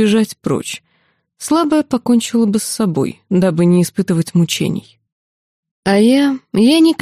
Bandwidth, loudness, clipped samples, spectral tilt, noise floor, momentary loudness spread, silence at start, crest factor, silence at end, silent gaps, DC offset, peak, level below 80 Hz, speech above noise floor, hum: 15.5 kHz; -15 LUFS; under 0.1%; -5.5 dB/octave; -61 dBFS; 9 LU; 0 s; 14 dB; 0.05 s; 5.12-5.63 s, 5.71-5.83 s; under 0.1%; -2 dBFS; -56 dBFS; 47 dB; none